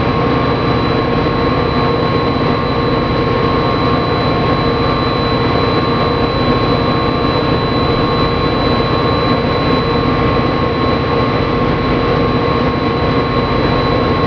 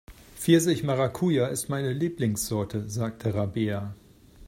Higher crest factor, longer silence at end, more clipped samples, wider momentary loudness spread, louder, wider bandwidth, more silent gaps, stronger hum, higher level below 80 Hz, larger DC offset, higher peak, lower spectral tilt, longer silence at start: second, 12 dB vs 20 dB; about the same, 0 s vs 0 s; neither; second, 1 LU vs 10 LU; first, -14 LUFS vs -27 LUFS; second, 5.4 kHz vs 16.5 kHz; neither; neither; first, -26 dBFS vs -56 dBFS; neither; first, 0 dBFS vs -8 dBFS; first, -8 dB/octave vs -5.5 dB/octave; about the same, 0 s vs 0.1 s